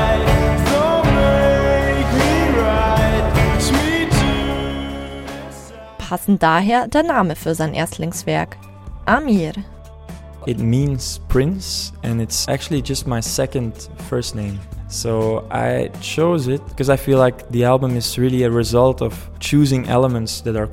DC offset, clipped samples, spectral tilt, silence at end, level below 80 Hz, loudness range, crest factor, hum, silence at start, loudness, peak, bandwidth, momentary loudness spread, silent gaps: under 0.1%; under 0.1%; -5.5 dB/octave; 0 s; -28 dBFS; 6 LU; 16 dB; none; 0 s; -18 LUFS; 0 dBFS; 16.5 kHz; 13 LU; none